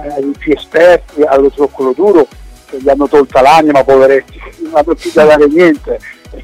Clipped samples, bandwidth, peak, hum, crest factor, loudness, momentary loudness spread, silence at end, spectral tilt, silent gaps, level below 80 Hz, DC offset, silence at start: 0.2%; 15 kHz; 0 dBFS; none; 8 dB; -9 LUFS; 11 LU; 0 s; -5.5 dB/octave; none; -34 dBFS; under 0.1%; 0 s